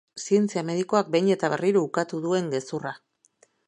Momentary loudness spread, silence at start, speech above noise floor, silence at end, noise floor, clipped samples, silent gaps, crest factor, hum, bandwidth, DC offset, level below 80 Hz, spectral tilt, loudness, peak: 10 LU; 0.15 s; 39 dB; 0.7 s; -63 dBFS; under 0.1%; none; 20 dB; none; 10.5 kHz; under 0.1%; -76 dBFS; -5.5 dB/octave; -25 LUFS; -6 dBFS